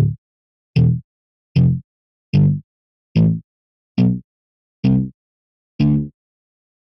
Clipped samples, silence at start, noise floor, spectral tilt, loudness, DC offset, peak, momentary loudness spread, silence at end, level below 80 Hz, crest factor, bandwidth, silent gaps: under 0.1%; 0 s; under -90 dBFS; -10.5 dB/octave; -19 LUFS; under 0.1%; -4 dBFS; 10 LU; 0.8 s; -42 dBFS; 16 dB; 5.8 kHz; 0.18-0.74 s, 1.04-1.55 s, 1.84-2.33 s, 2.64-3.15 s, 3.44-3.95 s, 4.24-4.83 s, 5.14-5.79 s